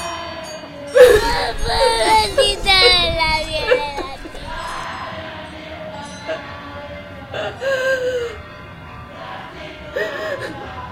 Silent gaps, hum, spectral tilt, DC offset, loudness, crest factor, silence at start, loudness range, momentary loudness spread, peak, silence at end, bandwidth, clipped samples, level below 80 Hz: none; none; -3 dB/octave; under 0.1%; -17 LUFS; 20 dB; 0 s; 15 LU; 21 LU; 0 dBFS; 0 s; 16 kHz; under 0.1%; -34 dBFS